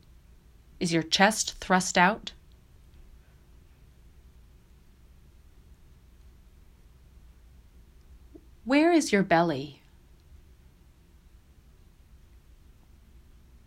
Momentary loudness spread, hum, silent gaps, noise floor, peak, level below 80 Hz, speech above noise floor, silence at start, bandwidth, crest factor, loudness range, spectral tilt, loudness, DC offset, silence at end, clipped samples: 15 LU; none; none; -56 dBFS; -6 dBFS; -54 dBFS; 31 dB; 0.8 s; 16 kHz; 26 dB; 8 LU; -4 dB/octave; -24 LUFS; under 0.1%; 3.95 s; under 0.1%